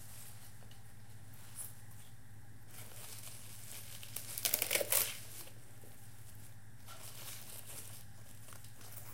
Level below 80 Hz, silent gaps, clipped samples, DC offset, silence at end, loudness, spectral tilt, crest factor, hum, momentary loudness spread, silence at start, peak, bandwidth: -68 dBFS; none; under 0.1%; 0.4%; 0 s; -39 LUFS; -1.5 dB/octave; 38 dB; none; 24 LU; 0 s; -8 dBFS; 17 kHz